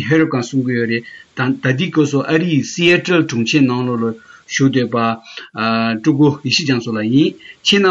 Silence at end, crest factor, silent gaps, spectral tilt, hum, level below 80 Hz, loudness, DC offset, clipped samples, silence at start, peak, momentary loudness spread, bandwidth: 0 s; 14 dB; none; -5 dB/octave; none; -60 dBFS; -16 LUFS; under 0.1%; under 0.1%; 0 s; -2 dBFS; 8 LU; 7.8 kHz